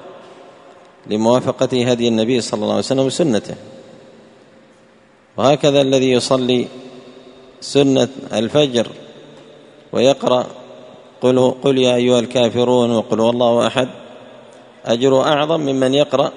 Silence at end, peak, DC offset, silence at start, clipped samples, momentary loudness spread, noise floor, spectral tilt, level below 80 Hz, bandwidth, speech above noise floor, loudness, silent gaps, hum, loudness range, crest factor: 0 s; 0 dBFS; under 0.1%; 0 s; under 0.1%; 11 LU; -50 dBFS; -5 dB/octave; -58 dBFS; 11 kHz; 34 dB; -16 LUFS; none; none; 4 LU; 18 dB